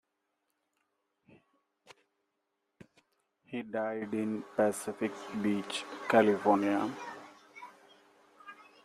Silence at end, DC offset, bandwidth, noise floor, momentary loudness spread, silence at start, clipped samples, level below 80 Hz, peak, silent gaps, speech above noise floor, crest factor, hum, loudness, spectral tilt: 0.2 s; under 0.1%; 15 kHz; -83 dBFS; 25 LU; 1.9 s; under 0.1%; -78 dBFS; -10 dBFS; none; 52 dB; 24 dB; none; -32 LUFS; -5 dB/octave